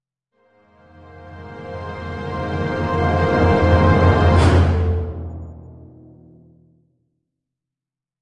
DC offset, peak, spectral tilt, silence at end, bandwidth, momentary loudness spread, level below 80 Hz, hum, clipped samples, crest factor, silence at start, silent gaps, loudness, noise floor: under 0.1%; -2 dBFS; -7.5 dB/octave; 2.4 s; 10 kHz; 21 LU; -34 dBFS; none; under 0.1%; 18 dB; 1.15 s; none; -17 LUFS; -88 dBFS